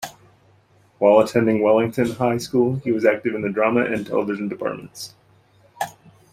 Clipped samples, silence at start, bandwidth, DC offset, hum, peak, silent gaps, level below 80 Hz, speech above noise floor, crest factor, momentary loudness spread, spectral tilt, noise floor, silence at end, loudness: under 0.1%; 0 s; 16 kHz; under 0.1%; none; -2 dBFS; none; -60 dBFS; 37 dB; 18 dB; 15 LU; -6.5 dB/octave; -56 dBFS; 0.4 s; -20 LUFS